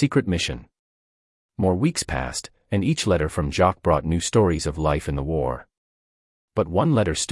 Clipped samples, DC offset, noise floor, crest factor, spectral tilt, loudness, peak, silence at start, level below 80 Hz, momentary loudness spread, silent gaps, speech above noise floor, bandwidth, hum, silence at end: under 0.1%; under 0.1%; under -90 dBFS; 18 dB; -5.5 dB/octave; -23 LUFS; -6 dBFS; 0 s; -40 dBFS; 9 LU; 0.79-1.49 s, 5.77-6.48 s; over 68 dB; 12 kHz; none; 0 s